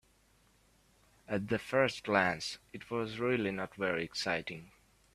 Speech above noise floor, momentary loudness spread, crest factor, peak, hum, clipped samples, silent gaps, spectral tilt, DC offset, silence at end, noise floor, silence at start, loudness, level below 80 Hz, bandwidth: 34 dB; 10 LU; 24 dB; -12 dBFS; none; under 0.1%; none; -5 dB/octave; under 0.1%; 0.45 s; -68 dBFS; 1.3 s; -34 LUFS; -68 dBFS; 14 kHz